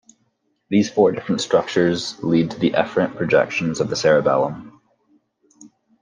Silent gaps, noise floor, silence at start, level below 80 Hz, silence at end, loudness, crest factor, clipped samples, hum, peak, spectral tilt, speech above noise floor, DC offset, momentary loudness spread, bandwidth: none; -68 dBFS; 0.7 s; -60 dBFS; 0.35 s; -19 LUFS; 18 dB; under 0.1%; none; -2 dBFS; -5.5 dB/octave; 49 dB; under 0.1%; 6 LU; 9.8 kHz